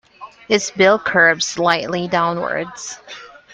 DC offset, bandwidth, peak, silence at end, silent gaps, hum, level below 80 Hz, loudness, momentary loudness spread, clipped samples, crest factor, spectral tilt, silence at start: under 0.1%; 10 kHz; 0 dBFS; 0.25 s; none; none; -58 dBFS; -16 LUFS; 18 LU; under 0.1%; 18 dB; -3 dB/octave; 0.2 s